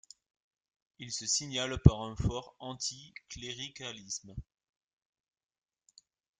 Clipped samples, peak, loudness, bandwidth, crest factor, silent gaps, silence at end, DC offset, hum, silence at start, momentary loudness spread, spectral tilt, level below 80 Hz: under 0.1%; -4 dBFS; -33 LUFS; 9.6 kHz; 32 dB; none; 1.95 s; under 0.1%; none; 1 s; 22 LU; -4.5 dB/octave; -46 dBFS